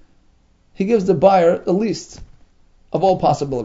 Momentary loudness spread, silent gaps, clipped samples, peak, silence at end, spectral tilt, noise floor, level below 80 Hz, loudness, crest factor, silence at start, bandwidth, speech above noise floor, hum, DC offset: 13 LU; none; under 0.1%; 0 dBFS; 0 s; -7 dB/octave; -55 dBFS; -46 dBFS; -17 LUFS; 18 dB; 0.8 s; 7.8 kHz; 39 dB; none; under 0.1%